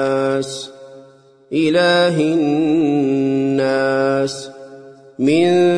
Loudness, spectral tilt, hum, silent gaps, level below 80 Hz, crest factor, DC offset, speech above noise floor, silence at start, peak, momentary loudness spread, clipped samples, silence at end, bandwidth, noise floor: -16 LUFS; -5.5 dB/octave; none; none; -62 dBFS; 12 dB; under 0.1%; 31 dB; 0 s; -4 dBFS; 14 LU; under 0.1%; 0 s; 10.5 kHz; -46 dBFS